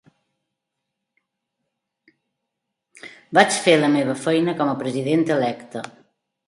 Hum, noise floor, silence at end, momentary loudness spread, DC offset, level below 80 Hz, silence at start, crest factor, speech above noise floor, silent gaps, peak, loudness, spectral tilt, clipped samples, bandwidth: none; -81 dBFS; 0.6 s; 18 LU; under 0.1%; -70 dBFS; 3.05 s; 24 dB; 61 dB; none; 0 dBFS; -19 LUFS; -4.5 dB/octave; under 0.1%; 11.5 kHz